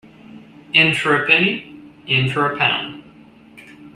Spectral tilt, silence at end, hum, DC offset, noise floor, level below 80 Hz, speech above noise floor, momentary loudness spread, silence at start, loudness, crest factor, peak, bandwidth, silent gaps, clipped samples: -5 dB/octave; 0.05 s; none; under 0.1%; -45 dBFS; -60 dBFS; 28 dB; 14 LU; 0.35 s; -16 LUFS; 20 dB; -2 dBFS; 13.5 kHz; none; under 0.1%